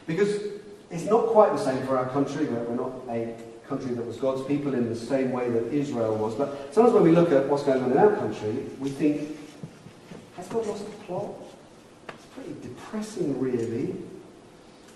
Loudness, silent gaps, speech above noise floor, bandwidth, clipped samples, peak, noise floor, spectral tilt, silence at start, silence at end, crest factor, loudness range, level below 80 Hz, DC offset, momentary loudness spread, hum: -25 LUFS; none; 25 dB; 12 kHz; under 0.1%; -4 dBFS; -50 dBFS; -7 dB/octave; 0.05 s; 0.05 s; 22 dB; 12 LU; -62 dBFS; under 0.1%; 22 LU; none